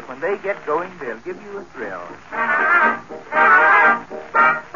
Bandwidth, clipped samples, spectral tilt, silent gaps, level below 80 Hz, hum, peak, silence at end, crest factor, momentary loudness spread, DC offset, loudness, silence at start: 7.2 kHz; under 0.1%; -1 dB/octave; none; -60 dBFS; none; -4 dBFS; 0.05 s; 16 dB; 19 LU; 0.4%; -16 LUFS; 0 s